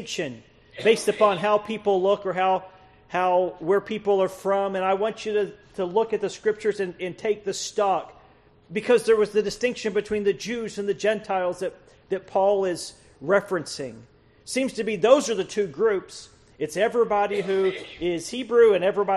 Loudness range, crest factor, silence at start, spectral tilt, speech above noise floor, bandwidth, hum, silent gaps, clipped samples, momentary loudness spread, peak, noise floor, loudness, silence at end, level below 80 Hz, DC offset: 3 LU; 20 dB; 0 s; -4.5 dB/octave; 31 dB; 12.5 kHz; none; none; under 0.1%; 11 LU; -4 dBFS; -55 dBFS; -24 LUFS; 0 s; -60 dBFS; under 0.1%